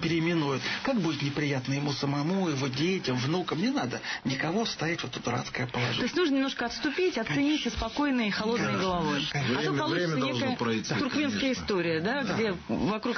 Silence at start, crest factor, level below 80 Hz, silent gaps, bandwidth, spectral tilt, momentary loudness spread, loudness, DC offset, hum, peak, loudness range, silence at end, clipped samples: 0 s; 12 dB; -54 dBFS; none; 6.6 kHz; -5 dB/octave; 4 LU; -29 LUFS; under 0.1%; none; -16 dBFS; 2 LU; 0 s; under 0.1%